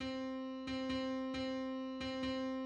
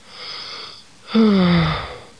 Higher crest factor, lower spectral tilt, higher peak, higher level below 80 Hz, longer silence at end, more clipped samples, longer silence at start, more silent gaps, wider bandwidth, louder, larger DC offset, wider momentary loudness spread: about the same, 12 dB vs 14 dB; second, -5 dB/octave vs -7 dB/octave; second, -28 dBFS vs -6 dBFS; second, -62 dBFS vs -40 dBFS; second, 0 s vs 0.2 s; neither; second, 0 s vs 0.15 s; neither; second, 9 kHz vs 10 kHz; second, -41 LUFS vs -17 LUFS; second, under 0.1% vs 0.3%; second, 3 LU vs 18 LU